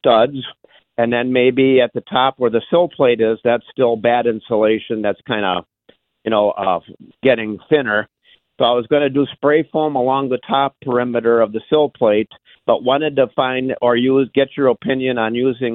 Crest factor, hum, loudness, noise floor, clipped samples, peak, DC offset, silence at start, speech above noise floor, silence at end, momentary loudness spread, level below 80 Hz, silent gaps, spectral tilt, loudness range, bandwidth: 14 dB; none; -17 LUFS; -55 dBFS; under 0.1%; -2 dBFS; under 0.1%; 0.05 s; 39 dB; 0 s; 6 LU; -58 dBFS; none; -10 dB/octave; 3 LU; 4.2 kHz